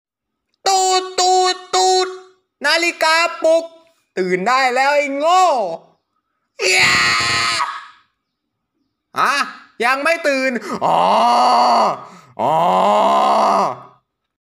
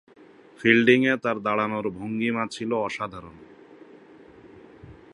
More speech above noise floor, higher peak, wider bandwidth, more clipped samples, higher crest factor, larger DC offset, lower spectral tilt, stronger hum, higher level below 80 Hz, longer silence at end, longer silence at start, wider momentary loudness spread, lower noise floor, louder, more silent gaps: first, 60 dB vs 26 dB; about the same, -2 dBFS vs -2 dBFS; first, 16 kHz vs 11 kHz; neither; second, 16 dB vs 24 dB; neither; second, -2 dB/octave vs -6 dB/octave; neither; about the same, -60 dBFS vs -62 dBFS; first, 0.6 s vs 0.2 s; about the same, 0.65 s vs 0.6 s; second, 10 LU vs 13 LU; first, -75 dBFS vs -49 dBFS; first, -15 LUFS vs -23 LUFS; neither